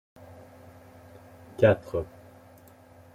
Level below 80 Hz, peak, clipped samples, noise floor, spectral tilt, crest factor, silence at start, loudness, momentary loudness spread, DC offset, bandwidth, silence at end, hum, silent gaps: -58 dBFS; -8 dBFS; under 0.1%; -53 dBFS; -8 dB/octave; 24 dB; 1.6 s; -25 LUFS; 28 LU; under 0.1%; 15.5 kHz; 1.1 s; none; none